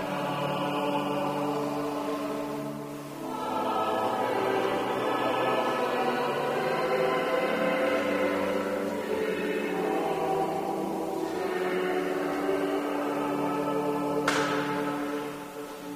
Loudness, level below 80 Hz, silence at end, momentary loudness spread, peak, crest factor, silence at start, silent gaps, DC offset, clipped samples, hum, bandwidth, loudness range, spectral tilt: -29 LUFS; -66 dBFS; 0 s; 6 LU; -10 dBFS; 18 dB; 0 s; none; under 0.1%; under 0.1%; none; 15.5 kHz; 3 LU; -5 dB/octave